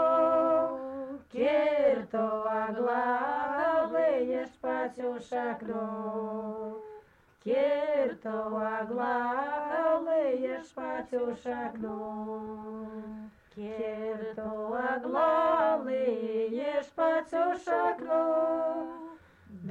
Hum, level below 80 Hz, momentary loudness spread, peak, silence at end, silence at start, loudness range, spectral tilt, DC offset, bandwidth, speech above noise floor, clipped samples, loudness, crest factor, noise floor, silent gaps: none; -68 dBFS; 14 LU; -16 dBFS; 0 s; 0 s; 8 LU; -6.5 dB/octave; under 0.1%; 8.4 kHz; 25 dB; under 0.1%; -30 LUFS; 16 dB; -56 dBFS; none